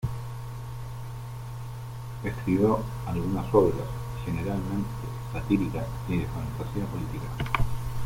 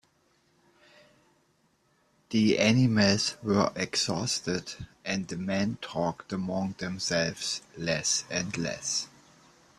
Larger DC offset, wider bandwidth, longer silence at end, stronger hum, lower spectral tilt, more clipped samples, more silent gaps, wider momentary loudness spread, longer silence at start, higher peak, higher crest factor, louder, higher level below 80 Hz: neither; first, 16.5 kHz vs 13 kHz; second, 0 s vs 0.7 s; neither; first, -7.5 dB/octave vs -4 dB/octave; neither; neither; first, 14 LU vs 10 LU; second, 0 s vs 2.3 s; first, -6 dBFS vs -10 dBFS; about the same, 22 dB vs 20 dB; about the same, -30 LUFS vs -28 LUFS; first, -40 dBFS vs -62 dBFS